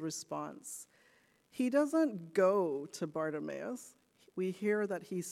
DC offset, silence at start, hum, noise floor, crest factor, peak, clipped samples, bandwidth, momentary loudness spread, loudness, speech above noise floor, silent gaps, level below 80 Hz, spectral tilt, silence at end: under 0.1%; 0 s; none; -69 dBFS; 18 dB; -18 dBFS; under 0.1%; 15.5 kHz; 16 LU; -35 LUFS; 34 dB; none; -86 dBFS; -5.5 dB/octave; 0 s